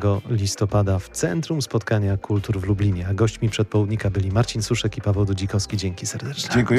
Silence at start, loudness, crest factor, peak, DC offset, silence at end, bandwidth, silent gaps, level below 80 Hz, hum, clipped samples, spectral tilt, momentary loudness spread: 0 s; -23 LUFS; 14 dB; -8 dBFS; under 0.1%; 0 s; 13.5 kHz; none; -42 dBFS; none; under 0.1%; -5.5 dB/octave; 3 LU